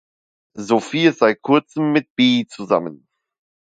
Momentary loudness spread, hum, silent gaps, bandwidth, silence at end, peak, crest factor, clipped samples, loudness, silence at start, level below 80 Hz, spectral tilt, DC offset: 6 LU; none; 2.10-2.16 s; 9.2 kHz; 0.7 s; 0 dBFS; 18 dB; under 0.1%; -18 LUFS; 0.55 s; -66 dBFS; -5.5 dB/octave; under 0.1%